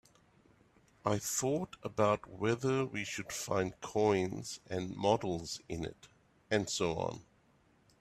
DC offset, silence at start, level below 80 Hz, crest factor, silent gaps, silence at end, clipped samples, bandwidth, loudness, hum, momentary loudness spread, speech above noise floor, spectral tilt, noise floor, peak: under 0.1%; 1.05 s; -64 dBFS; 22 dB; none; 0.8 s; under 0.1%; 15.5 kHz; -35 LUFS; none; 9 LU; 34 dB; -4.5 dB/octave; -69 dBFS; -14 dBFS